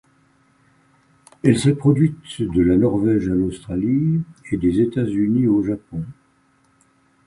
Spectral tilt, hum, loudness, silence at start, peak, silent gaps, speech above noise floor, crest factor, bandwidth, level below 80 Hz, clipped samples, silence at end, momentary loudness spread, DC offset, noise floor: -8 dB/octave; none; -19 LUFS; 1.45 s; -2 dBFS; none; 41 dB; 18 dB; 11.5 kHz; -44 dBFS; under 0.1%; 1.15 s; 11 LU; under 0.1%; -60 dBFS